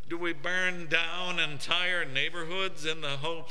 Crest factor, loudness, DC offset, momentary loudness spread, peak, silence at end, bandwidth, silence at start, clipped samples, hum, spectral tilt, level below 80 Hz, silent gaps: 22 dB; -30 LUFS; 3%; 6 LU; -8 dBFS; 0 s; 15.5 kHz; 0.05 s; under 0.1%; none; -3 dB/octave; -66 dBFS; none